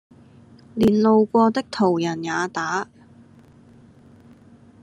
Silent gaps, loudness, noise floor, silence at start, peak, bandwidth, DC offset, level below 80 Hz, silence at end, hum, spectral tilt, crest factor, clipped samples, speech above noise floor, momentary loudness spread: none; -20 LUFS; -50 dBFS; 0.75 s; -6 dBFS; 9.8 kHz; under 0.1%; -58 dBFS; 2 s; none; -6 dB/octave; 18 dB; under 0.1%; 30 dB; 11 LU